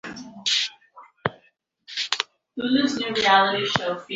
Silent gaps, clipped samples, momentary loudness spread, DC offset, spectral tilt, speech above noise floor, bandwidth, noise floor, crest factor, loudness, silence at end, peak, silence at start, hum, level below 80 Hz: none; under 0.1%; 13 LU; under 0.1%; -3 dB/octave; 42 dB; 8.2 kHz; -63 dBFS; 24 dB; -23 LUFS; 0 s; 0 dBFS; 0.05 s; none; -62 dBFS